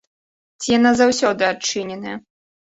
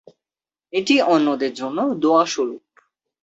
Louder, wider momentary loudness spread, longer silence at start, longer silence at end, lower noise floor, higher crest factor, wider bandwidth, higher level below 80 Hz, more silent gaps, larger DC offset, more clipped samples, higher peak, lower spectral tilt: about the same, -18 LUFS vs -19 LUFS; first, 16 LU vs 10 LU; second, 0.6 s vs 0.75 s; second, 0.5 s vs 0.65 s; about the same, under -90 dBFS vs under -90 dBFS; about the same, 16 dB vs 18 dB; about the same, 8 kHz vs 8 kHz; first, -56 dBFS vs -68 dBFS; neither; neither; neither; about the same, -4 dBFS vs -4 dBFS; about the same, -3 dB/octave vs -4 dB/octave